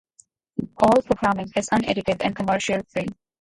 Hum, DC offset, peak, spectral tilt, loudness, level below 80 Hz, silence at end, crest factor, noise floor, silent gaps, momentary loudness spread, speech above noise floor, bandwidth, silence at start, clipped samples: none; under 0.1%; -4 dBFS; -5 dB/octave; -22 LUFS; -50 dBFS; 0.3 s; 20 dB; -58 dBFS; none; 14 LU; 36 dB; 11.5 kHz; 0.6 s; under 0.1%